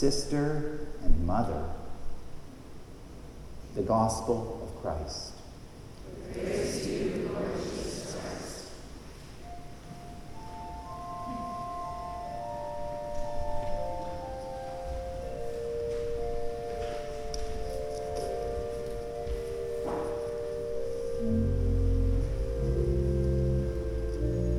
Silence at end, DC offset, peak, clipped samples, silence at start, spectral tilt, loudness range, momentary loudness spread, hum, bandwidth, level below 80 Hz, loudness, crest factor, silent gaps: 0 s; under 0.1%; -10 dBFS; under 0.1%; 0 s; -6.5 dB/octave; 9 LU; 18 LU; none; 13 kHz; -36 dBFS; -34 LUFS; 22 dB; none